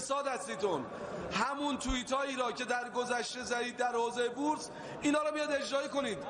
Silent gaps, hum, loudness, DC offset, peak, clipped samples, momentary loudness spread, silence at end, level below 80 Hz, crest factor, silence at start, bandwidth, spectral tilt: none; none; -34 LUFS; under 0.1%; -18 dBFS; under 0.1%; 4 LU; 0 s; -56 dBFS; 16 dB; 0 s; 11 kHz; -3 dB/octave